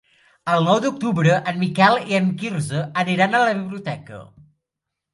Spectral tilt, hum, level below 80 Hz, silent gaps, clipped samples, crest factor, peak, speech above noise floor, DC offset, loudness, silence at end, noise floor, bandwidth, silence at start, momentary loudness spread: -6 dB/octave; none; -62 dBFS; none; under 0.1%; 20 dB; -2 dBFS; 63 dB; under 0.1%; -19 LUFS; 0.9 s; -83 dBFS; 11.5 kHz; 0.45 s; 14 LU